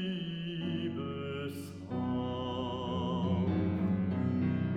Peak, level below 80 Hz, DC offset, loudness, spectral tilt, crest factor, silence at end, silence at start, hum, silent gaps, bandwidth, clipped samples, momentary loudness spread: -20 dBFS; -58 dBFS; under 0.1%; -34 LUFS; -8 dB/octave; 12 dB; 0 s; 0 s; none; none; 14 kHz; under 0.1%; 7 LU